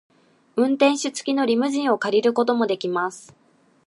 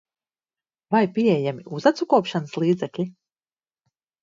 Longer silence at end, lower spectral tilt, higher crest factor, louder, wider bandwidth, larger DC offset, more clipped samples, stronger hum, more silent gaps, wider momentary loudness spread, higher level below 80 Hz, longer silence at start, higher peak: second, 0.7 s vs 1.1 s; second, -4 dB/octave vs -7 dB/octave; about the same, 18 dB vs 20 dB; about the same, -21 LUFS vs -23 LUFS; first, 11.5 kHz vs 7.6 kHz; neither; neither; neither; neither; about the same, 7 LU vs 9 LU; about the same, -74 dBFS vs -72 dBFS; second, 0.55 s vs 0.9 s; about the same, -4 dBFS vs -4 dBFS